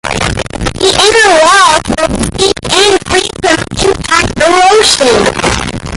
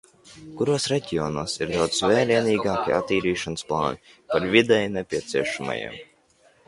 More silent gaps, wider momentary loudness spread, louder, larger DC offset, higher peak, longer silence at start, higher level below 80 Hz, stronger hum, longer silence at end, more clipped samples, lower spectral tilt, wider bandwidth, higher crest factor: neither; about the same, 8 LU vs 10 LU; first, -8 LUFS vs -23 LUFS; neither; about the same, 0 dBFS vs -2 dBFS; second, 0.05 s vs 0.25 s; first, -26 dBFS vs -52 dBFS; neither; second, 0 s vs 0.65 s; first, 0.3% vs under 0.1%; second, -2.5 dB/octave vs -4.5 dB/octave; first, 16 kHz vs 11.5 kHz; second, 8 dB vs 22 dB